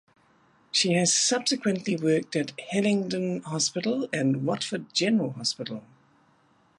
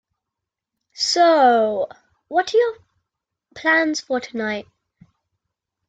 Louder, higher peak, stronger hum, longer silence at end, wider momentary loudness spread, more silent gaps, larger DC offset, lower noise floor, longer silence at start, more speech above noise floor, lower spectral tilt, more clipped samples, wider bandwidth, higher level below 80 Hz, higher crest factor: second, -26 LUFS vs -19 LUFS; second, -10 dBFS vs -4 dBFS; neither; second, 1 s vs 1.25 s; second, 9 LU vs 12 LU; neither; neither; second, -63 dBFS vs -84 dBFS; second, 0.75 s vs 0.95 s; second, 37 dB vs 66 dB; about the same, -3.5 dB/octave vs -2.5 dB/octave; neither; first, 11.5 kHz vs 9.4 kHz; about the same, -72 dBFS vs -68 dBFS; about the same, 18 dB vs 16 dB